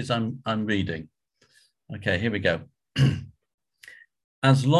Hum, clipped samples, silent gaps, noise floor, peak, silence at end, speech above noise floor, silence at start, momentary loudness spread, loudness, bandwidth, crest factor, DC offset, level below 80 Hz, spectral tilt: none; under 0.1%; 3.54-3.58 s, 4.24-4.42 s; -63 dBFS; -6 dBFS; 0 s; 39 dB; 0 s; 14 LU; -26 LUFS; 11.5 kHz; 20 dB; under 0.1%; -50 dBFS; -6.5 dB/octave